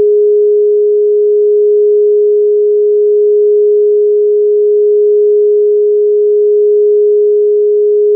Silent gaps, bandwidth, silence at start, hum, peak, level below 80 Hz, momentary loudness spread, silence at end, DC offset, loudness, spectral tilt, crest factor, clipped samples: none; 0.6 kHz; 0 s; none; -4 dBFS; under -90 dBFS; 1 LU; 0 s; under 0.1%; -9 LUFS; -1 dB/octave; 4 dB; under 0.1%